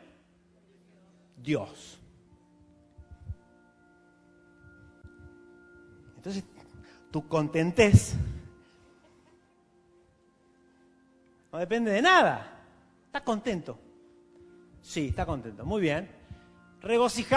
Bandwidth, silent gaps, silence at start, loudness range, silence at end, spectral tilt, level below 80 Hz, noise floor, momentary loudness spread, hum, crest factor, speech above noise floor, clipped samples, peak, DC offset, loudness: 11 kHz; none; 1.4 s; 17 LU; 0 s; -5.5 dB/octave; -48 dBFS; -64 dBFS; 28 LU; none; 26 dB; 38 dB; under 0.1%; -4 dBFS; under 0.1%; -27 LUFS